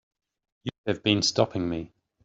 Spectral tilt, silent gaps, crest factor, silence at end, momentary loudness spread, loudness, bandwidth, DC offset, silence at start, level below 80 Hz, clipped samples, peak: -4 dB/octave; 0.78-0.84 s; 22 dB; 0.4 s; 16 LU; -26 LUFS; 8 kHz; under 0.1%; 0.65 s; -60 dBFS; under 0.1%; -6 dBFS